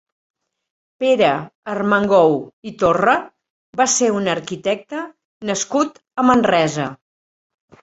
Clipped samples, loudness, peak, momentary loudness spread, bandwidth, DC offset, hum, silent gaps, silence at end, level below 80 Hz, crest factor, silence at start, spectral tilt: under 0.1%; -18 LUFS; 0 dBFS; 14 LU; 8.2 kHz; under 0.1%; none; 1.55-1.63 s, 2.53-2.62 s, 3.50-3.73 s, 5.25-5.40 s; 0.9 s; -56 dBFS; 18 dB; 1 s; -4 dB/octave